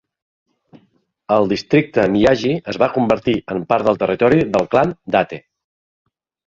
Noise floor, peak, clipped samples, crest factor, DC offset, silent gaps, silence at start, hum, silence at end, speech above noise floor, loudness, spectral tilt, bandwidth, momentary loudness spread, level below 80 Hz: -60 dBFS; -2 dBFS; under 0.1%; 16 dB; under 0.1%; none; 1.3 s; none; 1.1 s; 44 dB; -17 LUFS; -7 dB/octave; 7.8 kHz; 6 LU; -48 dBFS